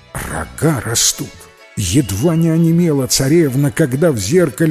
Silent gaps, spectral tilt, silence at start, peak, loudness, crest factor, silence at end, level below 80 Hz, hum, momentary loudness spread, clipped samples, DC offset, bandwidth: none; -5 dB/octave; 0.15 s; 0 dBFS; -15 LUFS; 14 dB; 0 s; -36 dBFS; none; 11 LU; under 0.1%; under 0.1%; 16 kHz